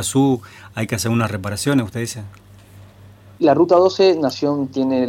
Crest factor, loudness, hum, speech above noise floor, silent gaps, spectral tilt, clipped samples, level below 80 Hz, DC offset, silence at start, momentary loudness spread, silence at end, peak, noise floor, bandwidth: 14 dB; -18 LUFS; none; 26 dB; none; -5.5 dB/octave; under 0.1%; -54 dBFS; under 0.1%; 0 s; 14 LU; 0 s; -4 dBFS; -44 dBFS; 17 kHz